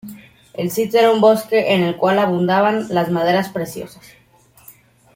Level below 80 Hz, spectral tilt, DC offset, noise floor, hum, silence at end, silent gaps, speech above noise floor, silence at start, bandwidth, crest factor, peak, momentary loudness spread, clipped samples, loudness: -60 dBFS; -5.5 dB/octave; under 0.1%; -47 dBFS; none; 1.25 s; none; 31 dB; 0.05 s; 16.5 kHz; 16 dB; -2 dBFS; 16 LU; under 0.1%; -16 LUFS